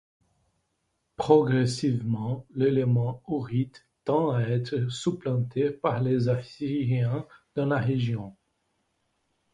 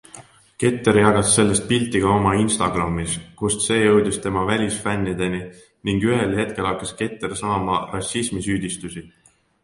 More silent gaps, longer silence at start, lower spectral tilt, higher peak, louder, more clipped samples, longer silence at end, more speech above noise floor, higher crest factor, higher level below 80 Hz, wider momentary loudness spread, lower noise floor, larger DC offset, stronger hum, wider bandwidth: neither; first, 1.2 s vs 0.15 s; first, -7.5 dB/octave vs -4.5 dB/octave; second, -6 dBFS vs 0 dBFS; second, -27 LUFS vs -20 LUFS; neither; first, 1.2 s vs 0.55 s; first, 51 dB vs 25 dB; about the same, 22 dB vs 20 dB; second, -62 dBFS vs -44 dBFS; about the same, 10 LU vs 11 LU; first, -77 dBFS vs -45 dBFS; neither; neither; about the same, 10.5 kHz vs 11.5 kHz